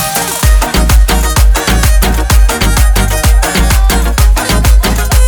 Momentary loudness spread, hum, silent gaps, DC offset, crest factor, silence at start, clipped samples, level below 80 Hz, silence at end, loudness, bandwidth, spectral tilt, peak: 1 LU; none; none; under 0.1%; 8 dB; 0 s; 0.5%; -8 dBFS; 0 s; -10 LUFS; over 20 kHz; -4 dB/octave; 0 dBFS